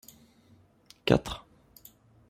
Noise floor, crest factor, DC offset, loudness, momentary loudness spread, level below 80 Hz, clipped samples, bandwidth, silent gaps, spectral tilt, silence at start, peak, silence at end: -61 dBFS; 28 dB; under 0.1%; -29 LUFS; 26 LU; -52 dBFS; under 0.1%; 16 kHz; none; -6 dB/octave; 1.05 s; -6 dBFS; 0.9 s